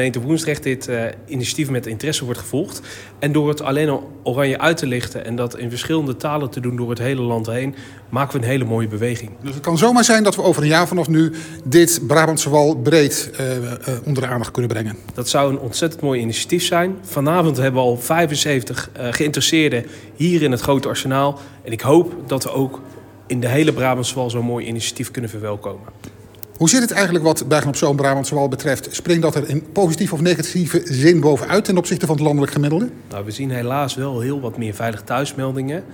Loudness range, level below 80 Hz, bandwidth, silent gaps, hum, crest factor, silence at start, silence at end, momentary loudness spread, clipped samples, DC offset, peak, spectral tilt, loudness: 6 LU; -54 dBFS; 18 kHz; none; none; 18 dB; 0 s; 0 s; 11 LU; under 0.1%; under 0.1%; 0 dBFS; -5 dB/octave; -18 LUFS